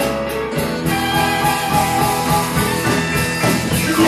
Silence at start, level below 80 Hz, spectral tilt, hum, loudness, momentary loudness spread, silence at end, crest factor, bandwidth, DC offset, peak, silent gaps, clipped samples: 0 s; -36 dBFS; -4 dB/octave; none; -17 LUFS; 4 LU; 0 s; 14 dB; 14 kHz; under 0.1%; -2 dBFS; none; under 0.1%